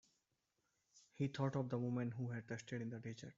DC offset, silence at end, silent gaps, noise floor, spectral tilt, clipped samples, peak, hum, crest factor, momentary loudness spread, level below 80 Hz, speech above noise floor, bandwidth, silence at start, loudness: under 0.1%; 0.05 s; none; -86 dBFS; -7 dB/octave; under 0.1%; -26 dBFS; none; 20 dB; 8 LU; -80 dBFS; 43 dB; 7.6 kHz; 0.95 s; -44 LUFS